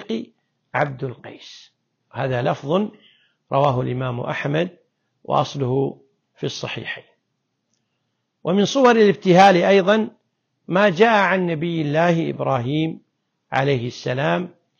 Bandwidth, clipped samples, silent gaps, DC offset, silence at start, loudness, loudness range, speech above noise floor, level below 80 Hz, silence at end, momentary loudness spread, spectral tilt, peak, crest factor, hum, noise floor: 7.2 kHz; under 0.1%; none; under 0.1%; 0 s; -19 LUFS; 10 LU; 55 dB; -60 dBFS; 0.3 s; 16 LU; -6 dB/octave; -4 dBFS; 16 dB; none; -74 dBFS